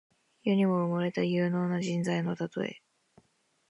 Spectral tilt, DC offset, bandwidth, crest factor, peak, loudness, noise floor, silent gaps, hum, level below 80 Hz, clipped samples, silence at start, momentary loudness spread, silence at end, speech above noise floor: -7 dB/octave; under 0.1%; 11 kHz; 16 dB; -16 dBFS; -30 LUFS; -71 dBFS; none; none; -76 dBFS; under 0.1%; 0.45 s; 9 LU; 0.95 s; 43 dB